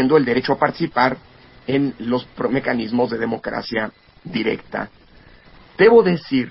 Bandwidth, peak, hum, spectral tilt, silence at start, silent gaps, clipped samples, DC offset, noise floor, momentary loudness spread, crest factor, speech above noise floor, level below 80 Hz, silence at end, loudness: 5.8 kHz; -2 dBFS; none; -10.5 dB/octave; 0 s; none; under 0.1%; under 0.1%; -47 dBFS; 15 LU; 18 dB; 28 dB; -52 dBFS; 0 s; -19 LUFS